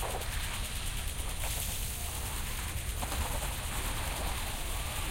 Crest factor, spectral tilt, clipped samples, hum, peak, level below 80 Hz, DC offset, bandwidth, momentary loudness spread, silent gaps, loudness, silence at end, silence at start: 18 dB; -2.5 dB/octave; under 0.1%; none; -16 dBFS; -38 dBFS; under 0.1%; 16.5 kHz; 2 LU; none; -36 LUFS; 0 s; 0 s